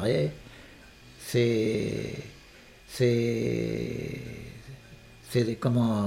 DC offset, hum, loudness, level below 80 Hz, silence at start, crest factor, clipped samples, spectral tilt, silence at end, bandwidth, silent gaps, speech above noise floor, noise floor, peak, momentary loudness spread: under 0.1%; none; -28 LUFS; -54 dBFS; 0 s; 18 dB; under 0.1%; -6.5 dB/octave; 0 s; 16 kHz; none; 25 dB; -52 dBFS; -12 dBFS; 23 LU